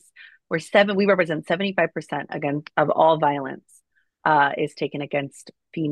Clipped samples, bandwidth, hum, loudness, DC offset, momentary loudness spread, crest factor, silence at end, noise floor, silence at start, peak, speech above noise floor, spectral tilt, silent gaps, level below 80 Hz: under 0.1%; 12 kHz; none; -22 LUFS; under 0.1%; 12 LU; 18 dB; 0 s; -60 dBFS; 0.2 s; -4 dBFS; 38 dB; -6 dB/octave; none; -70 dBFS